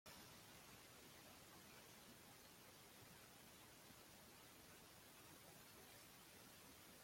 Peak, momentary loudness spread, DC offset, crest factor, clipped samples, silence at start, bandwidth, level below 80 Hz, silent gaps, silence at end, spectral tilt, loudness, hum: -48 dBFS; 1 LU; under 0.1%; 16 dB; under 0.1%; 0.05 s; 16.5 kHz; -84 dBFS; none; 0 s; -2.5 dB/octave; -63 LUFS; none